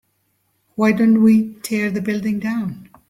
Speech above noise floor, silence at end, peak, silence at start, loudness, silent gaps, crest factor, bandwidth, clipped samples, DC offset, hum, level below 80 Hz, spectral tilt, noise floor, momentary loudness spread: 50 dB; 0.25 s; -4 dBFS; 0.8 s; -18 LUFS; none; 16 dB; 15 kHz; under 0.1%; under 0.1%; none; -58 dBFS; -6.5 dB/octave; -67 dBFS; 11 LU